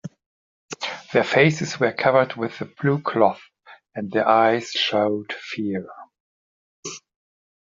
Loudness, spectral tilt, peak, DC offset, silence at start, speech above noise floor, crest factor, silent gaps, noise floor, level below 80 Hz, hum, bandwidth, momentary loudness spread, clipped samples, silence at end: -21 LUFS; -3.5 dB/octave; -2 dBFS; under 0.1%; 0.05 s; over 69 dB; 22 dB; 0.26-0.68 s, 6.20-6.83 s; under -90 dBFS; -64 dBFS; none; 7.6 kHz; 20 LU; under 0.1%; 0.7 s